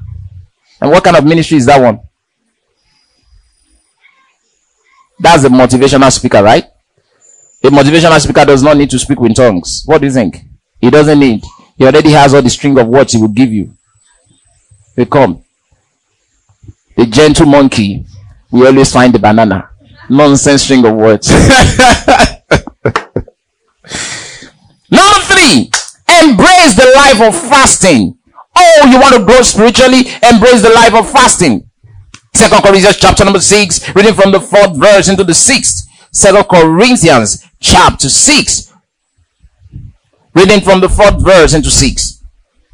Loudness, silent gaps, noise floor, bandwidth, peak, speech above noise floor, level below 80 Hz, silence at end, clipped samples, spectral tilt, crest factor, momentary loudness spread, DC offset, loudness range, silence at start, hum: -5 LUFS; none; -64 dBFS; 12 kHz; 0 dBFS; 59 dB; -26 dBFS; 0.6 s; 9%; -4 dB/octave; 6 dB; 11 LU; under 0.1%; 7 LU; 0.1 s; none